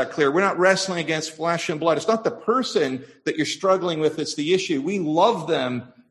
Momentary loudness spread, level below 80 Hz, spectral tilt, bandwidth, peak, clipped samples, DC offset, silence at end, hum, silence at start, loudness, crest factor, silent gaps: 7 LU; -68 dBFS; -4.5 dB/octave; 12 kHz; -4 dBFS; under 0.1%; under 0.1%; 0.25 s; none; 0 s; -22 LUFS; 18 dB; none